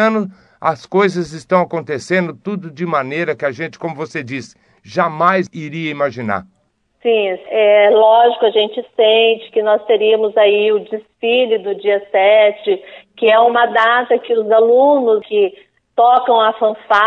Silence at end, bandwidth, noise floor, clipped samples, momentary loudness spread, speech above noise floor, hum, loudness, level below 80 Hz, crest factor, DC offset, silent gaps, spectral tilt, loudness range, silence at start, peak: 0 s; 9 kHz; -60 dBFS; under 0.1%; 13 LU; 46 dB; none; -14 LUFS; -62 dBFS; 14 dB; under 0.1%; none; -5.5 dB/octave; 7 LU; 0 s; 0 dBFS